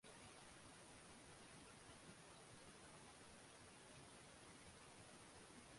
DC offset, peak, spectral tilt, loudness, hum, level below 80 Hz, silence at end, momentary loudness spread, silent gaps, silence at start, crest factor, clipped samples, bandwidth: under 0.1%; -48 dBFS; -3 dB/octave; -62 LUFS; none; -78 dBFS; 0 s; 1 LU; none; 0.05 s; 16 dB; under 0.1%; 11.5 kHz